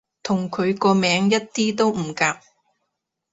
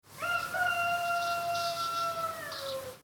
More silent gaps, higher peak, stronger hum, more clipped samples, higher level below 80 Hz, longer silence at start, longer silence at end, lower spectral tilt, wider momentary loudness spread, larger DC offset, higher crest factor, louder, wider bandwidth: neither; first, -4 dBFS vs -20 dBFS; neither; neither; first, -62 dBFS vs -70 dBFS; first, 0.25 s vs 0.05 s; first, 0.95 s vs 0.05 s; first, -4.5 dB/octave vs -1.5 dB/octave; about the same, 7 LU vs 8 LU; neither; about the same, 18 dB vs 14 dB; first, -21 LUFS vs -32 LUFS; second, 8 kHz vs over 20 kHz